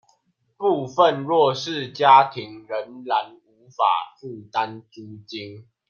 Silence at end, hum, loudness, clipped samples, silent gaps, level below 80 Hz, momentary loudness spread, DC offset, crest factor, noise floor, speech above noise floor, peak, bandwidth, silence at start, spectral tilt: 0.3 s; none; -21 LUFS; under 0.1%; none; -74 dBFS; 24 LU; under 0.1%; 20 dB; -67 dBFS; 45 dB; -2 dBFS; 7 kHz; 0.6 s; -5 dB/octave